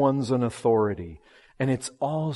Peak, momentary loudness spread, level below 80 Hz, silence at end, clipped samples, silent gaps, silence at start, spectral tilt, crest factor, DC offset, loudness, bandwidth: -8 dBFS; 9 LU; -58 dBFS; 0 s; under 0.1%; none; 0 s; -6.5 dB/octave; 16 dB; under 0.1%; -26 LUFS; 11.5 kHz